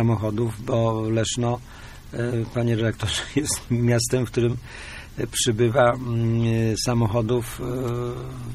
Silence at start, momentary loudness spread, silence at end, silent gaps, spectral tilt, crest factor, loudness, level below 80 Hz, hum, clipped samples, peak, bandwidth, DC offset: 0 s; 11 LU; 0 s; none; -5.5 dB/octave; 18 dB; -23 LUFS; -42 dBFS; none; under 0.1%; -4 dBFS; 14 kHz; under 0.1%